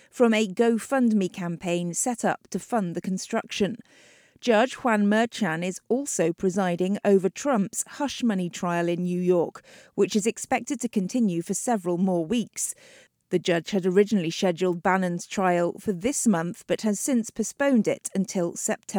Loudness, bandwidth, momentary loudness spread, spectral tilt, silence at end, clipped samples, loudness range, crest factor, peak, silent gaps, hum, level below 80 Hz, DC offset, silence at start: -25 LUFS; over 20 kHz; 7 LU; -5 dB/octave; 0 s; under 0.1%; 2 LU; 18 dB; -8 dBFS; none; none; -66 dBFS; under 0.1%; 0.15 s